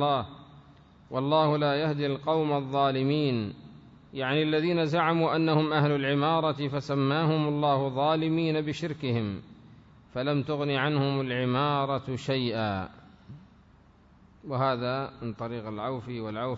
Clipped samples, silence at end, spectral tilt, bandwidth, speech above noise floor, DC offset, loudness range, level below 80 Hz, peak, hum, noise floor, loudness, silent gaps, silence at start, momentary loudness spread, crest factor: under 0.1%; 0 s; -7.5 dB/octave; 7.8 kHz; 30 dB; under 0.1%; 7 LU; -62 dBFS; -12 dBFS; none; -57 dBFS; -28 LUFS; none; 0 s; 11 LU; 16 dB